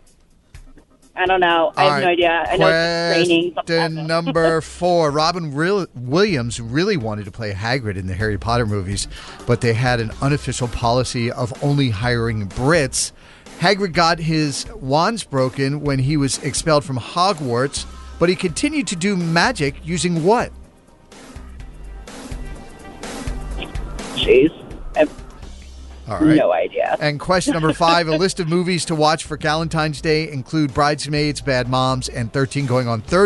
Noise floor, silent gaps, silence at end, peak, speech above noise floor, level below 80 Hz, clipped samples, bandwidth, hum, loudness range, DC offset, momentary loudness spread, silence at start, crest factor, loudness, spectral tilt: -52 dBFS; none; 0 s; -2 dBFS; 34 dB; -38 dBFS; under 0.1%; 11.5 kHz; none; 5 LU; under 0.1%; 14 LU; 0.55 s; 16 dB; -19 LUFS; -5 dB/octave